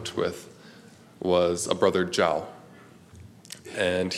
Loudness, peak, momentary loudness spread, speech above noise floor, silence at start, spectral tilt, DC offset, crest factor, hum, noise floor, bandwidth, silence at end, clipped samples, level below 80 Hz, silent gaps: -26 LUFS; -6 dBFS; 19 LU; 26 dB; 0 s; -4 dB/octave; under 0.1%; 22 dB; none; -51 dBFS; 15 kHz; 0 s; under 0.1%; -62 dBFS; none